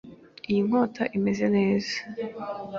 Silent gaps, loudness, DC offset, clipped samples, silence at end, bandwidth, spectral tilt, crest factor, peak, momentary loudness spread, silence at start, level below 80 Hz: none; -26 LUFS; under 0.1%; under 0.1%; 0 s; 7.2 kHz; -6.5 dB/octave; 16 dB; -10 dBFS; 12 LU; 0.05 s; -62 dBFS